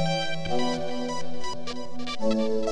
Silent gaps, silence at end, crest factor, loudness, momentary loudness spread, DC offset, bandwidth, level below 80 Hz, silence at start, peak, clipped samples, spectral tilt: none; 0 s; 12 dB; -30 LUFS; 9 LU; under 0.1%; 11.5 kHz; -52 dBFS; 0 s; -12 dBFS; under 0.1%; -5 dB/octave